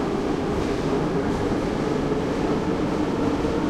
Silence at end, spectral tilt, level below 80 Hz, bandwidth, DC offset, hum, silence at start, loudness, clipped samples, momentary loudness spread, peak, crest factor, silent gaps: 0 s; -7 dB/octave; -38 dBFS; 13 kHz; under 0.1%; none; 0 s; -24 LUFS; under 0.1%; 1 LU; -10 dBFS; 12 dB; none